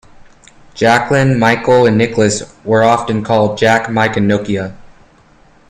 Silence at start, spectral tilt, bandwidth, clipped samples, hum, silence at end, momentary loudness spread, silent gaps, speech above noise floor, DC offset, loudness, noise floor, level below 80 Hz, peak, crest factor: 0.75 s; -5.5 dB/octave; 12.5 kHz; under 0.1%; none; 0.8 s; 6 LU; none; 34 dB; under 0.1%; -12 LUFS; -46 dBFS; -44 dBFS; 0 dBFS; 14 dB